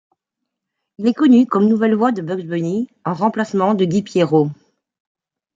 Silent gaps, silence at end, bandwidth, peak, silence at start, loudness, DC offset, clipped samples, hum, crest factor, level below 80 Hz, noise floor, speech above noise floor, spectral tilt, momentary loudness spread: none; 1 s; 7.6 kHz; -2 dBFS; 1 s; -17 LUFS; under 0.1%; under 0.1%; none; 14 dB; -66 dBFS; -80 dBFS; 64 dB; -7.5 dB/octave; 10 LU